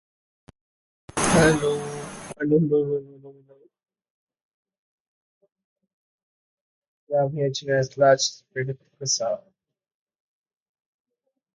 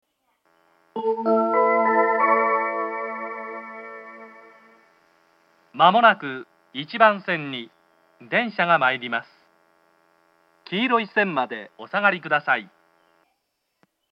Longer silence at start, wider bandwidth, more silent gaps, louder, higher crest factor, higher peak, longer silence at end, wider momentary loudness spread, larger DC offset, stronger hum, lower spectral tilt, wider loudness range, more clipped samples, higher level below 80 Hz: first, 1.15 s vs 0.95 s; first, 11.5 kHz vs 5.8 kHz; first, 4.10-4.27 s, 4.42-4.65 s, 4.78-5.41 s, 5.64-5.76 s, 5.93-6.82 s, 6.88-7.07 s vs none; about the same, -23 LUFS vs -21 LUFS; about the same, 20 dB vs 24 dB; second, -6 dBFS vs 0 dBFS; first, 2.15 s vs 1.5 s; second, 14 LU vs 18 LU; neither; neither; second, -4.5 dB/octave vs -7 dB/octave; first, 8 LU vs 4 LU; neither; first, -52 dBFS vs -86 dBFS